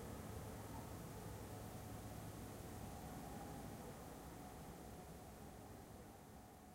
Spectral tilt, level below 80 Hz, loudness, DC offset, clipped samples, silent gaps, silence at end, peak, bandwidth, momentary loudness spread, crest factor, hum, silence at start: -5.5 dB/octave; -62 dBFS; -54 LUFS; under 0.1%; under 0.1%; none; 0 s; -40 dBFS; 16 kHz; 5 LU; 14 dB; none; 0 s